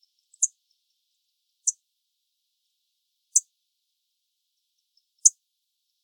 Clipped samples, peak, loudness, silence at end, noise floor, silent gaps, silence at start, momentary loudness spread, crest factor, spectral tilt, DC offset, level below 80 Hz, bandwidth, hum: under 0.1%; -2 dBFS; -23 LUFS; 0.75 s; -79 dBFS; none; 0.4 s; 8 LU; 32 dB; 10.5 dB/octave; under 0.1%; under -90 dBFS; 19 kHz; none